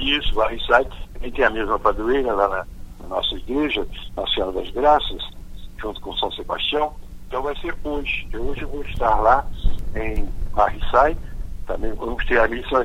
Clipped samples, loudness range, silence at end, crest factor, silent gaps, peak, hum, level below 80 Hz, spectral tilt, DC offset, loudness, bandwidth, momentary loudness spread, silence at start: under 0.1%; 4 LU; 0 s; 20 dB; none; 0 dBFS; none; -30 dBFS; -5.5 dB/octave; under 0.1%; -22 LUFS; 7.4 kHz; 14 LU; 0 s